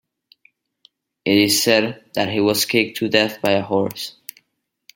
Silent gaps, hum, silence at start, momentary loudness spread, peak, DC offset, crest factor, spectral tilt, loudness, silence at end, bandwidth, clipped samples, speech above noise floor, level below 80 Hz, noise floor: none; none; 1.25 s; 14 LU; 0 dBFS; under 0.1%; 20 dB; -3.5 dB/octave; -18 LUFS; 0.85 s; 17 kHz; under 0.1%; 53 dB; -62 dBFS; -72 dBFS